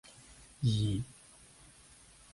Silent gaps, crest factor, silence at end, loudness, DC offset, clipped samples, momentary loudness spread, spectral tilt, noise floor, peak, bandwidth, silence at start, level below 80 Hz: none; 18 dB; 1.25 s; -34 LUFS; under 0.1%; under 0.1%; 25 LU; -6 dB/octave; -59 dBFS; -20 dBFS; 11.5 kHz; 0.3 s; -56 dBFS